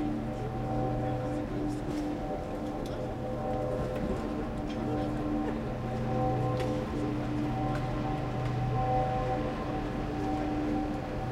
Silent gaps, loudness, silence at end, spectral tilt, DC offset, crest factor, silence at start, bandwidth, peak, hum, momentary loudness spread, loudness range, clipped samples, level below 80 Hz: none; -33 LUFS; 0 s; -8 dB/octave; under 0.1%; 14 dB; 0 s; 12.5 kHz; -18 dBFS; none; 5 LU; 3 LU; under 0.1%; -42 dBFS